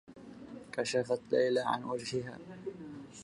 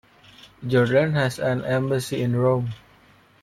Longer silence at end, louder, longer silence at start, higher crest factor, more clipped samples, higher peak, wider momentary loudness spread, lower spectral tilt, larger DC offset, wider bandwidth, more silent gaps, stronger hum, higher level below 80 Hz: second, 0 s vs 0.65 s; second, -34 LUFS vs -22 LUFS; second, 0.05 s vs 0.6 s; about the same, 18 dB vs 16 dB; neither; second, -18 dBFS vs -8 dBFS; first, 19 LU vs 11 LU; second, -4.5 dB/octave vs -6.5 dB/octave; neither; second, 11.5 kHz vs 14 kHz; neither; neither; second, -72 dBFS vs -56 dBFS